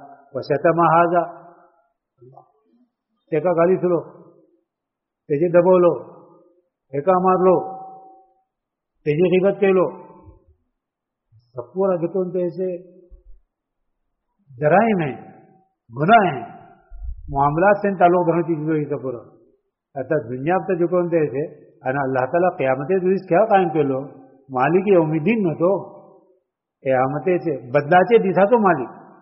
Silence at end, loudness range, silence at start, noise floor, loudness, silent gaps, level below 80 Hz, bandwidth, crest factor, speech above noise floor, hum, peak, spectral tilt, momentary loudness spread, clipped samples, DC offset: 0.2 s; 5 LU; 0 s; -83 dBFS; -19 LUFS; none; -50 dBFS; 5.6 kHz; 18 dB; 65 dB; none; -2 dBFS; -6.5 dB/octave; 17 LU; under 0.1%; under 0.1%